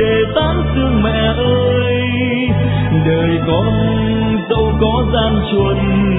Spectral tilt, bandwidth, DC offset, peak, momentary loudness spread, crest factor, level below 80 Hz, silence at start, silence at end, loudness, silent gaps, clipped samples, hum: -11 dB/octave; 4 kHz; under 0.1%; -2 dBFS; 2 LU; 12 dB; -24 dBFS; 0 s; 0 s; -14 LUFS; none; under 0.1%; none